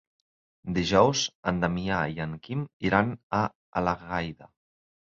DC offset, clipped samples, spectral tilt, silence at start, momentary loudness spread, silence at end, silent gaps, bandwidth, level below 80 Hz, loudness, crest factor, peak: under 0.1%; under 0.1%; -5 dB/octave; 0.65 s; 12 LU; 0.6 s; 1.35-1.43 s, 2.73-2.80 s, 3.23-3.30 s, 3.55-3.73 s; 7.6 kHz; -50 dBFS; -27 LUFS; 24 dB; -6 dBFS